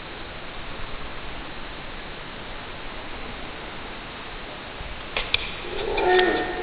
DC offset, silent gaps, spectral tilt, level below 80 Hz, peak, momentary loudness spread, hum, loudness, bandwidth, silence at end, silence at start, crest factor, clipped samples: under 0.1%; none; -8.5 dB/octave; -40 dBFS; -2 dBFS; 15 LU; none; -29 LUFS; 5.2 kHz; 0 s; 0 s; 28 dB; under 0.1%